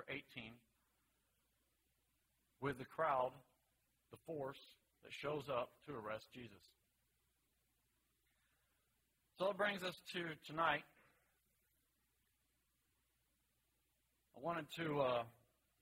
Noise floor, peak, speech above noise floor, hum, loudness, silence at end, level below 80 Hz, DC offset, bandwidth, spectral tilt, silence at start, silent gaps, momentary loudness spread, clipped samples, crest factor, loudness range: -84 dBFS; -24 dBFS; 40 dB; none; -44 LUFS; 0.5 s; -80 dBFS; under 0.1%; 16 kHz; -5.5 dB/octave; 0 s; none; 16 LU; under 0.1%; 24 dB; 9 LU